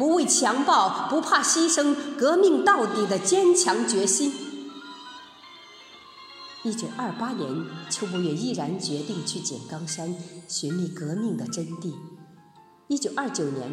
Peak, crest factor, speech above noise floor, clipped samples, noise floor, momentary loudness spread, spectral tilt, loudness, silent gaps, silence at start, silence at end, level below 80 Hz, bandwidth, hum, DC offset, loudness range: -6 dBFS; 20 dB; 30 dB; under 0.1%; -54 dBFS; 21 LU; -3.5 dB/octave; -24 LUFS; none; 0 s; 0 s; -78 dBFS; 16 kHz; none; under 0.1%; 11 LU